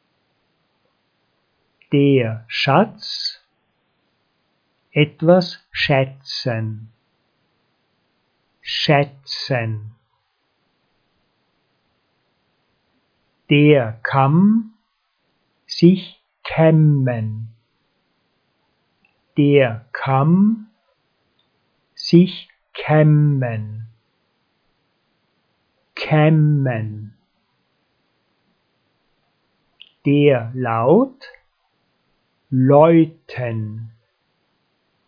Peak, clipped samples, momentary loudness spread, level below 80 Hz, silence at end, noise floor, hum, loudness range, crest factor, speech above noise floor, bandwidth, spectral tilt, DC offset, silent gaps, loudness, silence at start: 0 dBFS; under 0.1%; 17 LU; -62 dBFS; 1.2 s; -69 dBFS; none; 6 LU; 20 dB; 53 dB; 5.2 kHz; -8 dB/octave; under 0.1%; none; -17 LUFS; 1.9 s